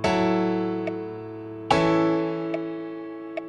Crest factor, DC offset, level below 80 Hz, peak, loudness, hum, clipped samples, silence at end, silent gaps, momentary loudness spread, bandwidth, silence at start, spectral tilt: 20 dB; under 0.1%; -56 dBFS; -4 dBFS; -25 LUFS; none; under 0.1%; 0 s; none; 15 LU; 10.5 kHz; 0 s; -6.5 dB/octave